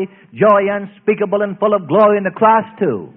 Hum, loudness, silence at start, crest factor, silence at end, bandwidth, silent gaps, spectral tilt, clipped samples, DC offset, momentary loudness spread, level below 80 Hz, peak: none; -14 LUFS; 0 s; 14 dB; 0.1 s; 4 kHz; none; -10.5 dB/octave; under 0.1%; under 0.1%; 8 LU; -60 dBFS; 0 dBFS